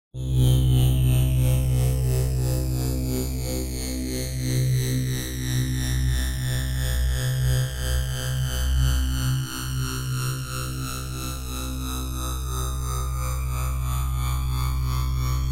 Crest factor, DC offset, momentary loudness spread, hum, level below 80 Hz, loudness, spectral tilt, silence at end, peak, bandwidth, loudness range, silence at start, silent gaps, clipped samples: 14 dB; under 0.1%; 8 LU; none; -28 dBFS; -25 LUFS; -5 dB/octave; 0 s; -10 dBFS; 16 kHz; 6 LU; 0.15 s; none; under 0.1%